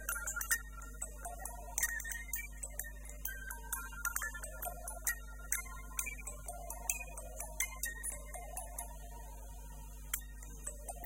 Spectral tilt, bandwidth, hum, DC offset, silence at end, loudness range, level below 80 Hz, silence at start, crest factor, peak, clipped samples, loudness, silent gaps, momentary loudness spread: -1.5 dB/octave; 17 kHz; 50 Hz at -50 dBFS; under 0.1%; 0 s; 3 LU; -48 dBFS; 0 s; 30 dB; -14 dBFS; under 0.1%; -41 LUFS; none; 13 LU